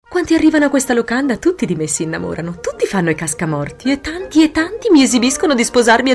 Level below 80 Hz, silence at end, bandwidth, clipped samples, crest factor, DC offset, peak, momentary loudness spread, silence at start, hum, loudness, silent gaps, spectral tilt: -44 dBFS; 0 s; 12 kHz; under 0.1%; 12 dB; under 0.1%; -2 dBFS; 9 LU; 0.1 s; none; -15 LUFS; none; -4 dB/octave